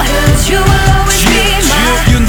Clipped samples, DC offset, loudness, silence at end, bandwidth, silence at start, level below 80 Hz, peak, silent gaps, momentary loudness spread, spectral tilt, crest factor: 0.4%; under 0.1%; -9 LUFS; 0 s; over 20 kHz; 0 s; -14 dBFS; 0 dBFS; none; 1 LU; -4 dB/octave; 8 dB